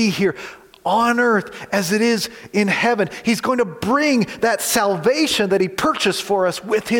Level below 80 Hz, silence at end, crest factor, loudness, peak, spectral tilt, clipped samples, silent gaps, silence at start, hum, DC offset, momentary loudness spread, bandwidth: -56 dBFS; 0 s; 14 dB; -18 LUFS; -4 dBFS; -4 dB/octave; under 0.1%; none; 0 s; none; under 0.1%; 5 LU; 17 kHz